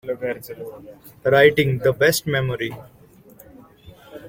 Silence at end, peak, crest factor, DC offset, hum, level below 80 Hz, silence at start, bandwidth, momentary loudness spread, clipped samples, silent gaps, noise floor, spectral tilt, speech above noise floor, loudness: 0 s; -2 dBFS; 20 dB; under 0.1%; none; -52 dBFS; 0.05 s; 16.5 kHz; 22 LU; under 0.1%; none; -48 dBFS; -5 dB/octave; 28 dB; -19 LUFS